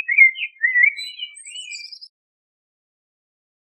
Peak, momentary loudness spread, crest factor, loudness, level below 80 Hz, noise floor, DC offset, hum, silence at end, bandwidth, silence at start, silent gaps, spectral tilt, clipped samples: -2 dBFS; 21 LU; 20 dB; -14 LUFS; under -90 dBFS; -36 dBFS; under 0.1%; none; 1.6 s; 12.5 kHz; 0 s; none; 12.5 dB/octave; under 0.1%